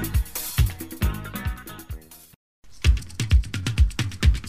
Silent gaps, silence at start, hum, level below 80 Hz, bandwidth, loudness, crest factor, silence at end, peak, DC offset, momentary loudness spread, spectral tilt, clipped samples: 2.36-2.62 s; 0 s; none; -26 dBFS; 15.5 kHz; -25 LUFS; 16 dB; 0 s; -8 dBFS; 0.6%; 15 LU; -4.5 dB/octave; under 0.1%